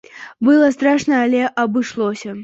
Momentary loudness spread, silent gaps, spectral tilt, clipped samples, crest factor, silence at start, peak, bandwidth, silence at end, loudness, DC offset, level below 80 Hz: 9 LU; none; -5 dB/octave; under 0.1%; 14 dB; 0.15 s; -4 dBFS; 8 kHz; 0 s; -16 LUFS; under 0.1%; -60 dBFS